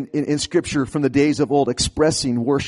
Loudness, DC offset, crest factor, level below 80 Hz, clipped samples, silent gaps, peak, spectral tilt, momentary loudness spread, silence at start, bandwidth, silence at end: -19 LUFS; under 0.1%; 14 dB; -42 dBFS; under 0.1%; none; -6 dBFS; -5 dB/octave; 4 LU; 0 s; 11.5 kHz; 0 s